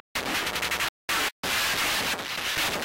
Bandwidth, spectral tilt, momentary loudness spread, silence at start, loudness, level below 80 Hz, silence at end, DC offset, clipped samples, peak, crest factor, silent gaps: 17 kHz; -1 dB/octave; 4 LU; 0.15 s; -26 LUFS; -52 dBFS; 0 s; under 0.1%; under 0.1%; -18 dBFS; 10 dB; 0.89-1.08 s, 1.32-1.43 s